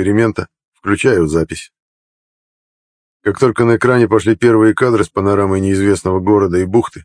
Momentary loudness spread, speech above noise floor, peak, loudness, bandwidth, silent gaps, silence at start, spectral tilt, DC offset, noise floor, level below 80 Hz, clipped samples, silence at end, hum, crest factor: 10 LU; over 77 dB; 0 dBFS; -13 LUFS; 10.5 kHz; 0.65-0.72 s, 1.80-3.20 s; 0 s; -7 dB/octave; under 0.1%; under -90 dBFS; -42 dBFS; under 0.1%; 0.05 s; none; 14 dB